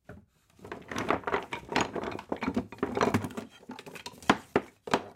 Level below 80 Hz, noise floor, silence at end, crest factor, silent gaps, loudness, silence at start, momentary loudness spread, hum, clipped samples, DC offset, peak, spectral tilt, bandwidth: -58 dBFS; -56 dBFS; 0 s; 26 dB; none; -32 LUFS; 0.1 s; 16 LU; none; under 0.1%; under 0.1%; -6 dBFS; -4.5 dB/octave; 16.5 kHz